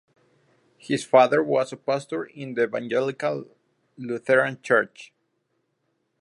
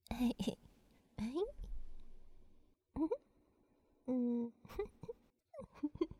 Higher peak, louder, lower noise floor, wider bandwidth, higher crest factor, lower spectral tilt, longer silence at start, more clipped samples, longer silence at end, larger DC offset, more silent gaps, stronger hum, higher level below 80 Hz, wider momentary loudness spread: first, -4 dBFS vs -24 dBFS; first, -24 LUFS vs -42 LUFS; about the same, -74 dBFS vs -74 dBFS; second, 11.5 kHz vs 15.5 kHz; about the same, 22 dB vs 20 dB; about the same, -5.5 dB/octave vs -6.5 dB/octave; first, 0.85 s vs 0.1 s; neither; first, 1.15 s vs 0.05 s; neither; neither; neither; second, -76 dBFS vs -56 dBFS; second, 14 LU vs 19 LU